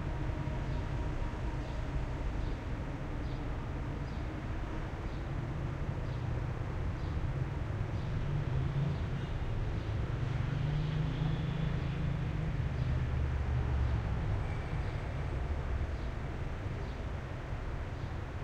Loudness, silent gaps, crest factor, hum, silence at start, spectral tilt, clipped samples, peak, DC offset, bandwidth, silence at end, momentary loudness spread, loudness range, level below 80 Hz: -37 LUFS; none; 14 dB; none; 0 s; -8 dB/octave; under 0.1%; -20 dBFS; under 0.1%; 8.8 kHz; 0 s; 6 LU; 4 LU; -40 dBFS